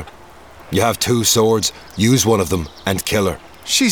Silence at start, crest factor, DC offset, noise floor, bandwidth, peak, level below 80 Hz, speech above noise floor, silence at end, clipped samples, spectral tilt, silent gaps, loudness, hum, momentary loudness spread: 0 s; 16 dB; 0.3%; -41 dBFS; over 20 kHz; -2 dBFS; -42 dBFS; 25 dB; 0 s; under 0.1%; -4 dB/octave; none; -17 LUFS; none; 9 LU